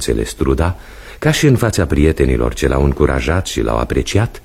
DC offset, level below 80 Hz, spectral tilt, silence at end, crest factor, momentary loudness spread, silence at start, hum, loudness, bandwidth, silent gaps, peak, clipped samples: under 0.1%; -22 dBFS; -6 dB/octave; 0.05 s; 14 dB; 6 LU; 0 s; none; -15 LUFS; 15.5 kHz; none; 0 dBFS; under 0.1%